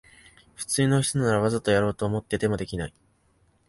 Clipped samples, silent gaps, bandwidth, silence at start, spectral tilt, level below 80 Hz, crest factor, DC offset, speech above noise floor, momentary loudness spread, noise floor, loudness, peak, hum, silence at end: under 0.1%; none; 11.5 kHz; 0.6 s; -5 dB/octave; -50 dBFS; 18 dB; under 0.1%; 40 dB; 11 LU; -65 dBFS; -25 LUFS; -8 dBFS; none; 0.8 s